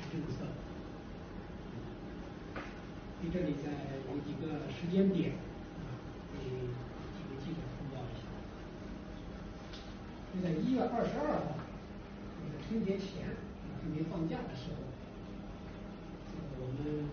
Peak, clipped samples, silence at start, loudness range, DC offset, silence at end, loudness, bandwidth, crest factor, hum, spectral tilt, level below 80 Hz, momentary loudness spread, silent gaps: -18 dBFS; under 0.1%; 0 s; 7 LU; under 0.1%; 0 s; -40 LUFS; 6.6 kHz; 20 dB; none; -7 dB/octave; -54 dBFS; 13 LU; none